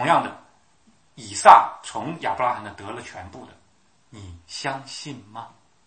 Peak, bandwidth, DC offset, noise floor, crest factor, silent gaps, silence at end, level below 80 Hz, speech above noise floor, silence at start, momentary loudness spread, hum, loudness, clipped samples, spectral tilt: 0 dBFS; 11 kHz; under 0.1%; -63 dBFS; 24 dB; none; 0.4 s; -62 dBFS; 41 dB; 0 s; 28 LU; none; -19 LUFS; under 0.1%; -3.5 dB/octave